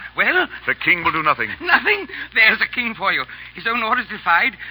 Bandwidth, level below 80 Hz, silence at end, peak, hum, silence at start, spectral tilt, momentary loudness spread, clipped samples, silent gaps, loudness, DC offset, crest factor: over 20 kHz; -52 dBFS; 0 s; -2 dBFS; none; 0 s; -8 dB/octave; 8 LU; under 0.1%; none; -17 LUFS; under 0.1%; 18 dB